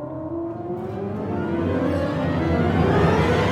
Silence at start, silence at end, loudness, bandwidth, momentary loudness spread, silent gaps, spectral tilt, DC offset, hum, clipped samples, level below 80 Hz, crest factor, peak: 0 s; 0 s; -23 LUFS; 12 kHz; 11 LU; none; -8 dB/octave; under 0.1%; none; under 0.1%; -38 dBFS; 16 dB; -6 dBFS